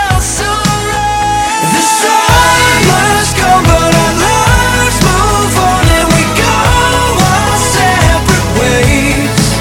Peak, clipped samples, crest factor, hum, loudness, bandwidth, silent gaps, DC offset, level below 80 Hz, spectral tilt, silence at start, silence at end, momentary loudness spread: 0 dBFS; 0.4%; 8 dB; none; -8 LUFS; 19.5 kHz; none; under 0.1%; -20 dBFS; -3.5 dB/octave; 0 s; 0 s; 5 LU